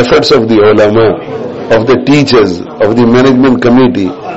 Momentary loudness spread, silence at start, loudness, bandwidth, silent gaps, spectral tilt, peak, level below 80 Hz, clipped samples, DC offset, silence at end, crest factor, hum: 7 LU; 0 s; -7 LUFS; 8 kHz; none; -6.5 dB/octave; 0 dBFS; -36 dBFS; 0.1%; under 0.1%; 0 s; 6 dB; none